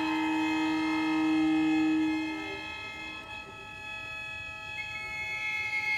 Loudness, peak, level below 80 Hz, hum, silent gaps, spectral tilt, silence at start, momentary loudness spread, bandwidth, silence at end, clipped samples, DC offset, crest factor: -31 LUFS; -20 dBFS; -60 dBFS; none; none; -4.5 dB/octave; 0 s; 12 LU; 11.5 kHz; 0 s; under 0.1%; under 0.1%; 12 dB